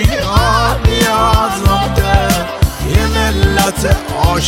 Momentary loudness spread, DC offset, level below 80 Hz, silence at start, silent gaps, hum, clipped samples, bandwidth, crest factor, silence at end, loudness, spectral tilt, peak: 4 LU; under 0.1%; -18 dBFS; 0 s; none; none; under 0.1%; 16.5 kHz; 12 dB; 0 s; -13 LUFS; -4.5 dB/octave; 0 dBFS